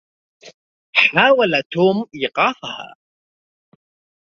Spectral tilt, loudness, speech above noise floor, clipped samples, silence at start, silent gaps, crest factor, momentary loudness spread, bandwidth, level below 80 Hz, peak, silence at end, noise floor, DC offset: -5.5 dB/octave; -16 LUFS; over 73 dB; under 0.1%; 0.45 s; 0.54-0.93 s, 1.66-1.70 s; 20 dB; 17 LU; 7.2 kHz; -64 dBFS; 0 dBFS; 1.35 s; under -90 dBFS; under 0.1%